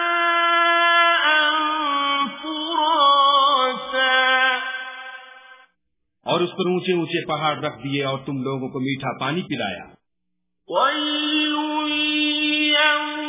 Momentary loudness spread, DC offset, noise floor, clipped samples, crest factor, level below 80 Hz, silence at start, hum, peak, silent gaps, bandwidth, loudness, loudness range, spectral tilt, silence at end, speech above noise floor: 12 LU; under 0.1%; -79 dBFS; under 0.1%; 16 dB; -66 dBFS; 0 s; none; -4 dBFS; none; 3.9 kHz; -19 LUFS; 8 LU; -7.5 dB/octave; 0 s; 56 dB